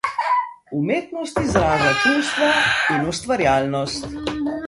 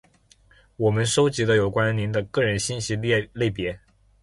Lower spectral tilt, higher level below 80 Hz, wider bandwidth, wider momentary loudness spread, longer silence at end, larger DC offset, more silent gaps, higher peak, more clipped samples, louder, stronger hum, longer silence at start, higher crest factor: about the same, -4.5 dB/octave vs -5 dB/octave; first, -42 dBFS vs -48 dBFS; about the same, 11.5 kHz vs 11.5 kHz; first, 10 LU vs 6 LU; second, 0 s vs 0.45 s; neither; neither; first, -4 dBFS vs -8 dBFS; neither; first, -20 LUFS vs -23 LUFS; neither; second, 0.05 s vs 0.8 s; about the same, 18 dB vs 16 dB